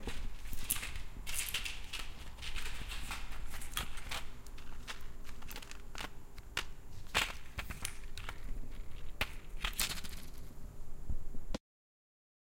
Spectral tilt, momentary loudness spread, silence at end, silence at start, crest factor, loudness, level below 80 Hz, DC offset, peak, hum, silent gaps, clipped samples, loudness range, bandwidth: -2 dB/octave; 16 LU; 1 s; 0 s; 24 dB; -42 LUFS; -44 dBFS; under 0.1%; -14 dBFS; none; none; under 0.1%; 4 LU; 17 kHz